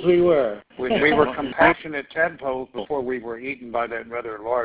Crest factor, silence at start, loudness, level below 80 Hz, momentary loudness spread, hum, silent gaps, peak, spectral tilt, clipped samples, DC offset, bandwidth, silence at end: 20 dB; 0 s; -22 LUFS; -52 dBFS; 12 LU; none; none; -2 dBFS; -9 dB/octave; under 0.1%; under 0.1%; 4 kHz; 0 s